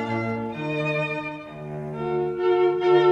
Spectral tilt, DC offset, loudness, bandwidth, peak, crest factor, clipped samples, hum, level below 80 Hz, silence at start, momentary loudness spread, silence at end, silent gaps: -8 dB/octave; under 0.1%; -24 LUFS; 6.8 kHz; -8 dBFS; 16 dB; under 0.1%; none; -58 dBFS; 0 s; 14 LU; 0 s; none